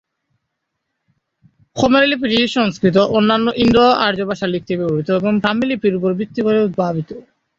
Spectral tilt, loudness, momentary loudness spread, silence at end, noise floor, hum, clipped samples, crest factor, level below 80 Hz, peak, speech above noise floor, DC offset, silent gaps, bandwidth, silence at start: -6 dB/octave; -16 LUFS; 8 LU; 0.4 s; -75 dBFS; none; under 0.1%; 16 dB; -46 dBFS; -2 dBFS; 60 dB; under 0.1%; none; 7.8 kHz; 1.75 s